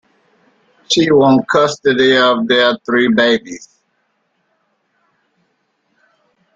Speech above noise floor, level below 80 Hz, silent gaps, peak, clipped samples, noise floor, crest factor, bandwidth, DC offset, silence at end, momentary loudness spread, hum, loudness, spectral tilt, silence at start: 52 dB; -56 dBFS; none; 0 dBFS; under 0.1%; -65 dBFS; 16 dB; 9 kHz; under 0.1%; 3 s; 6 LU; none; -12 LUFS; -4 dB/octave; 0.9 s